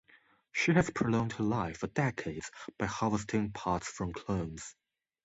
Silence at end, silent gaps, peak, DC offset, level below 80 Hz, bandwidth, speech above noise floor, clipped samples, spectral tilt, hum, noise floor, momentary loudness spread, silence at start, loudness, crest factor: 0.5 s; none; -12 dBFS; under 0.1%; -56 dBFS; 8.2 kHz; 32 dB; under 0.1%; -6 dB/octave; none; -65 dBFS; 13 LU; 0.55 s; -33 LUFS; 22 dB